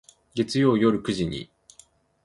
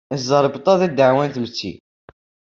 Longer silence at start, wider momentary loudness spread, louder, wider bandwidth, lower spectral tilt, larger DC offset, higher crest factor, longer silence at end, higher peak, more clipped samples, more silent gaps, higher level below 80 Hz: first, 0.35 s vs 0.1 s; first, 16 LU vs 12 LU; second, -24 LUFS vs -18 LUFS; first, 11.5 kHz vs 7.4 kHz; about the same, -6 dB/octave vs -5.5 dB/octave; neither; about the same, 18 dB vs 18 dB; about the same, 0.8 s vs 0.85 s; second, -8 dBFS vs -2 dBFS; neither; neither; first, -54 dBFS vs -60 dBFS